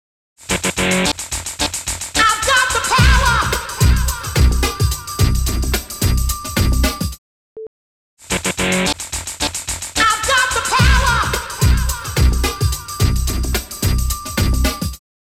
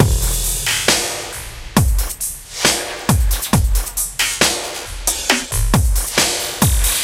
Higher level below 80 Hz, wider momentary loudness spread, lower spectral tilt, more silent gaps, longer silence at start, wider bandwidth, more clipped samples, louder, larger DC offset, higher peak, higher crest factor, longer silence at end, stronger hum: about the same, -22 dBFS vs -22 dBFS; about the same, 9 LU vs 8 LU; about the same, -3.5 dB/octave vs -3 dB/octave; first, 7.18-7.56 s, 7.67-8.17 s vs none; first, 0.4 s vs 0 s; about the same, 17 kHz vs 17 kHz; neither; about the same, -17 LUFS vs -17 LUFS; neither; about the same, -2 dBFS vs 0 dBFS; about the same, 16 dB vs 18 dB; first, 0.3 s vs 0 s; neither